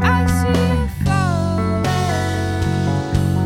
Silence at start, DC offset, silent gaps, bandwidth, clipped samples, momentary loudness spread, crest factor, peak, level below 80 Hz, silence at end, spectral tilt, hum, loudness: 0 s; under 0.1%; none; 16 kHz; under 0.1%; 3 LU; 14 dB; -2 dBFS; -30 dBFS; 0 s; -6.5 dB/octave; none; -18 LUFS